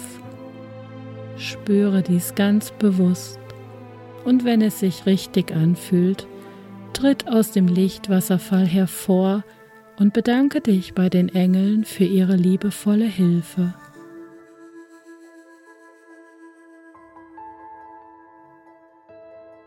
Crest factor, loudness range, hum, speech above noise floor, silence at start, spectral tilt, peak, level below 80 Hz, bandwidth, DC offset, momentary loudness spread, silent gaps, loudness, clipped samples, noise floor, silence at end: 16 dB; 4 LU; none; 32 dB; 0 s; -7 dB/octave; -6 dBFS; -60 dBFS; 16.5 kHz; under 0.1%; 22 LU; none; -20 LUFS; under 0.1%; -51 dBFS; 0.25 s